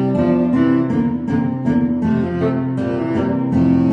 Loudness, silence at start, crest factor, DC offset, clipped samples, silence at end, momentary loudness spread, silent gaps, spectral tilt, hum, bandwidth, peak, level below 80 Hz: -17 LUFS; 0 s; 12 dB; under 0.1%; under 0.1%; 0 s; 4 LU; none; -10 dB/octave; none; 5.8 kHz; -4 dBFS; -44 dBFS